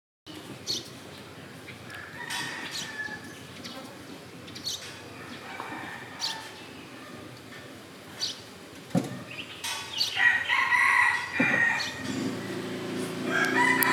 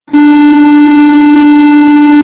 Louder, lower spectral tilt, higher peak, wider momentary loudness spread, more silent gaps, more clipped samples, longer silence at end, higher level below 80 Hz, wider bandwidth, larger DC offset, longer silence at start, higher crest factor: second, -27 LUFS vs -4 LUFS; second, -3 dB/octave vs -8.5 dB/octave; about the same, -2 dBFS vs 0 dBFS; first, 21 LU vs 0 LU; neither; second, under 0.1% vs 30%; about the same, 0 s vs 0 s; second, -74 dBFS vs -44 dBFS; first, over 20 kHz vs 4 kHz; neither; first, 0.25 s vs 0.1 s; first, 28 dB vs 4 dB